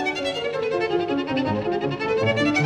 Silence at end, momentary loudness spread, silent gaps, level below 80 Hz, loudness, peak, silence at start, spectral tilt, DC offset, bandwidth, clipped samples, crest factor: 0 s; 5 LU; none; -56 dBFS; -23 LUFS; -10 dBFS; 0 s; -5.5 dB/octave; under 0.1%; 11 kHz; under 0.1%; 14 dB